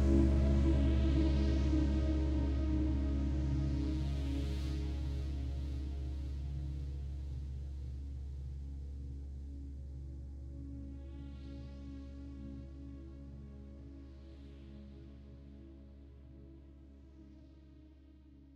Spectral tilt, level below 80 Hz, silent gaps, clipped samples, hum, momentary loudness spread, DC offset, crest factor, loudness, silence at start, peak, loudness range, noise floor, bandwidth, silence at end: -8.5 dB/octave; -38 dBFS; none; under 0.1%; none; 24 LU; under 0.1%; 18 dB; -38 LUFS; 0 s; -18 dBFS; 21 LU; -58 dBFS; 7.4 kHz; 0 s